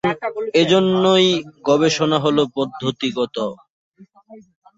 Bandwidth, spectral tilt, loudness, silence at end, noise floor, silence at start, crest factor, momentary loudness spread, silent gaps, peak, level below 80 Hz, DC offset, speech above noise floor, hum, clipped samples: 8 kHz; -5 dB/octave; -18 LUFS; 0.4 s; -45 dBFS; 0.05 s; 16 dB; 9 LU; 3.70-3.92 s; -2 dBFS; -60 dBFS; under 0.1%; 28 dB; none; under 0.1%